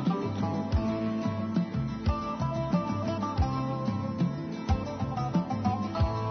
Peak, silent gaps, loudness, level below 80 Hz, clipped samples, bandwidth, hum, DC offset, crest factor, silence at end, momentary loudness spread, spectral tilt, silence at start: -16 dBFS; none; -31 LUFS; -40 dBFS; under 0.1%; 6.6 kHz; none; under 0.1%; 14 dB; 0 s; 2 LU; -8 dB/octave; 0 s